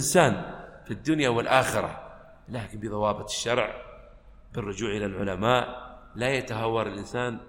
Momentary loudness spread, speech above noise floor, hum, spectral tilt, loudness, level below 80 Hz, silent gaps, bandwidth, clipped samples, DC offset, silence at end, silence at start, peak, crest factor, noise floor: 18 LU; 23 dB; none; -4.5 dB/octave; -27 LUFS; -50 dBFS; none; 16.5 kHz; under 0.1%; under 0.1%; 0 s; 0 s; -4 dBFS; 22 dB; -50 dBFS